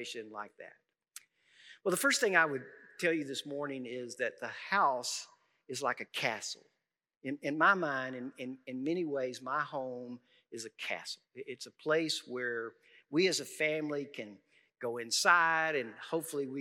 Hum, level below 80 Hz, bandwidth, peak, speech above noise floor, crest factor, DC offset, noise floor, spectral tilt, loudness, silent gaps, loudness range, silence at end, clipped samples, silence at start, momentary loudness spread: none; under -90 dBFS; 16 kHz; -12 dBFS; 53 dB; 24 dB; under 0.1%; -87 dBFS; -3 dB/octave; -33 LUFS; 7.17-7.21 s; 6 LU; 0 s; under 0.1%; 0 s; 19 LU